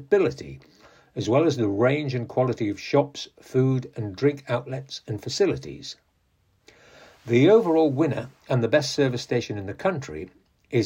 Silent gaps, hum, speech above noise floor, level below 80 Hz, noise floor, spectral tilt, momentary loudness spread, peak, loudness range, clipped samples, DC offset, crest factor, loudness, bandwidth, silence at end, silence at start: none; none; 43 dB; -60 dBFS; -67 dBFS; -6.5 dB/octave; 17 LU; -6 dBFS; 5 LU; under 0.1%; under 0.1%; 18 dB; -24 LUFS; 16 kHz; 0 s; 0 s